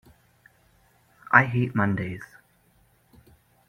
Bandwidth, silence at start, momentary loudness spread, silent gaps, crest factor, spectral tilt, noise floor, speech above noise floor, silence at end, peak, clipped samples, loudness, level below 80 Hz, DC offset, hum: 15 kHz; 1.3 s; 20 LU; none; 28 dB; -8 dB/octave; -63 dBFS; 40 dB; 1.45 s; 0 dBFS; under 0.1%; -23 LUFS; -60 dBFS; under 0.1%; none